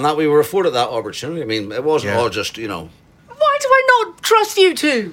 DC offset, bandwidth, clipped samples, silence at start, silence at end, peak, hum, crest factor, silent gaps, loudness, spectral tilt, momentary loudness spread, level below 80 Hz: under 0.1%; 17 kHz; under 0.1%; 0 s; 0 s; -2 dBFS; none; 16 dB; none; -16 LUFS; -3.5 dB/octave; 12 LU; -56 dBFS